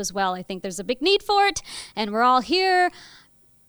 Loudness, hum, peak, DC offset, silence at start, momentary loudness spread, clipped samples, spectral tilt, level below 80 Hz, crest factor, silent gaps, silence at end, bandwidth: -22 LUFS; none; -6 dBFS; under 0.1%; 0 s; 12 LU; under 0.1%; -2.5 dB/octave; -54 dBFS; 16 dB; none; 0.65 s; over 20 kHz